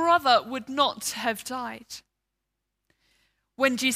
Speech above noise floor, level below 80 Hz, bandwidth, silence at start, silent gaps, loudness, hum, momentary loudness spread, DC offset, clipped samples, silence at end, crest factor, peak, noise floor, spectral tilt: 56 dB; -72 dBFS; 16 kHz; 0 s; none; -25 LUFS; none; 19 LU; under 0.1%; under 0.1%; 0 s; 20 dB; -8 dBFS; -82 dBFS; -2 dB/octave